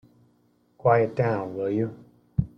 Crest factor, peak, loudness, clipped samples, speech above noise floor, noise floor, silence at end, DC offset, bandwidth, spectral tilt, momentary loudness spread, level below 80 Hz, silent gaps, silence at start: 18 dB; -8 dBFS; -25 LUFS; under 0.1%; 41 dB; -65 dBFS; 0.1 s; under 0.1%; 6.2 kHz; -10 dB/octave; 9 LU; -50 dBFS; none; 0.85 s